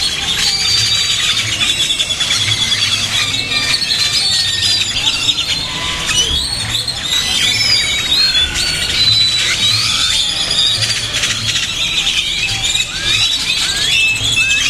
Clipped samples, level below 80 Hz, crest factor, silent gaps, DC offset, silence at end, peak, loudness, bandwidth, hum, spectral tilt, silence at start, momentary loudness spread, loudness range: under 0.1%; -34 dBFS; 14 dB; none; under 0.1%; 0 s; 0 dBFS; -12 LUFS; 16 kHz; none; 0 dB/octave; 0 s; 4 LU; 2 LU